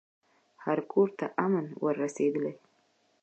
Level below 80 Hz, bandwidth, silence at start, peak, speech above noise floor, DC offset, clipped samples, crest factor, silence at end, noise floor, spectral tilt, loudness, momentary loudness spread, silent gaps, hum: -86 dBFS; 8.6 kHz; 0.6 s; -12 dBFS; 41 dB; under 0.1%; under 0.1%; 20 dB; 0.7 s; -70 dBFS; -7.5 dB/octave; -30 LUFS; 7 LU; none; none